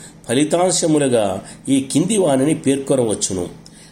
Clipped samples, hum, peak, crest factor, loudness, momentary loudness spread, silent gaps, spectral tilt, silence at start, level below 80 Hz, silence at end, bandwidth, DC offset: under 0.1%; none; -2 dBFS; 16 dB; -17 LUFS; 7 LU; none; -4.5 dB/octave; 0 s; -54 dBFS; 0.35 s; 16 kHz; under 0.1%